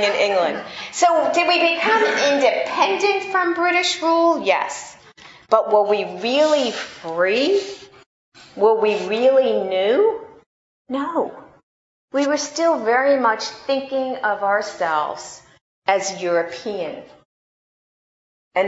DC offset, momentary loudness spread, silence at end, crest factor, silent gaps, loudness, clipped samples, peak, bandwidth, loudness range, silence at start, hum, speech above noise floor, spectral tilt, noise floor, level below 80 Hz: under 0.1%; 12 LU; 0 s; 20 dB; 8.06-8.32 s, 10.46-10.85 s, 11.63-12.08 s, 15.61-15.82 s, 17.25-18.51 s; -19 LUFS; under 0.1%; 0 dBFS; 8 kHz; 5 LU; 0 s; none; 27 dB; -2.5 dB/octave; -46 dBFS; -68 dBFS